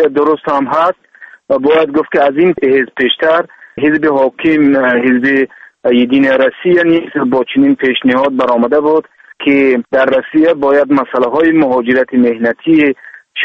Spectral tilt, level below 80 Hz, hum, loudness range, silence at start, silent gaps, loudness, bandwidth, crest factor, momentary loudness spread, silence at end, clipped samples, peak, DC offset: -7.5 dB/octave; -52 dBFS; none; 1 LU; 0 s; none; -11 LUFS; 6 kHz; 10 dB; 5 LU; 0 s; under 0.1%; 0 dBFS; under 0.1%